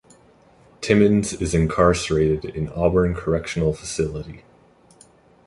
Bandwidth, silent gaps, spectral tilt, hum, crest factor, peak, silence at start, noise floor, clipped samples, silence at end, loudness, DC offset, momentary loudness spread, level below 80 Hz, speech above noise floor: 11.5 kHz; none; -6 dB/octave; none; 20 dB; -2 dBFS; 0.8 s; -53 dBFS; under 0.1%; 1.1 s; -21 LUFS; under 0.1%; 10 LU; -36 dBFS; 33 dB